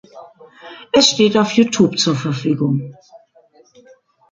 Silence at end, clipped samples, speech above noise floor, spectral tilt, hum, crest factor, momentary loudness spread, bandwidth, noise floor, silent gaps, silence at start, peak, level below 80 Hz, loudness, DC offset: 1.15 s; under 0.1%; 36 dB; -4.5 dB/octave; none; 18 dB; 18 LU; 9.4 kHz; -52 dBFS; none; 0.15 s; 0 dBFS; -58 dBFS; -15 LUFS; under 0.1%